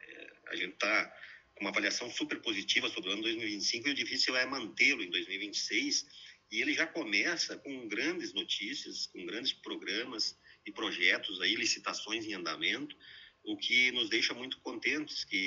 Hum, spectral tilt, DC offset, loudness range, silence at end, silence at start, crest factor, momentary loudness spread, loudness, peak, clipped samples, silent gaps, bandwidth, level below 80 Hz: none; -1 dB/octave; under 0.1%; 3 LU; 0 s; 0.05 s; 22 dB; 13 LU; -32 LUFS; -12 dBFS; under 0.1%; none; 8 kHz; -80 dBFS